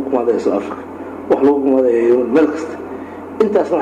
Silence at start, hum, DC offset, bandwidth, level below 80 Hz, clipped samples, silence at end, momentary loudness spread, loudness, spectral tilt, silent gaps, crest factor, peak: 0 s; none; under 0.1%; 9.4 kHz; -56 dBFS; under 0.1%; 0 s; 16 LU; -15 LUFS; -7 dB/octave; none; 14 dB; -2 dBFS